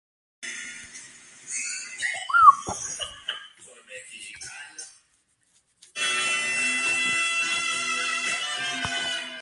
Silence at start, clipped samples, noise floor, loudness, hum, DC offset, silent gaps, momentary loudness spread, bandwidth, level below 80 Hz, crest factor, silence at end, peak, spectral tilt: 0.4 s; under 0.1%; -67 dBFS; -23 LUFS; none; under 0.1%; none; 19 LU; 11.5 kHz; -62 dBFS; 26 dB; 0 s; -2 dBFS; 0.5 dB/octave